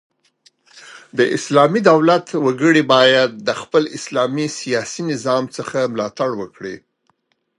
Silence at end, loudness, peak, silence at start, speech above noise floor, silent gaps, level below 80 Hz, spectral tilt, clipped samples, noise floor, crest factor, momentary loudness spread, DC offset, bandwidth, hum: 0.8 s; -17 LUFS; 0 dBFS; 0.75 s; 49 dB; none; -66 dBFS; -4.5 dB/octave; under 0.1%; -65 dBFS; 18 dB; 12 LU; under 0.1%; 11.5 kHz; none